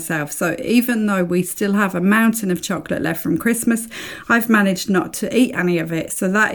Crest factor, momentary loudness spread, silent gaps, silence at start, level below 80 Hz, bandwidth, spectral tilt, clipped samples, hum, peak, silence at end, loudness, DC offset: 16 dB; 7 LU; none; 0 s; -54 dBFS; 19 kHz; -5 dB/octave; under 0.1%; none; -2 dBFS; 0 s; -18 LUFS; 0.1%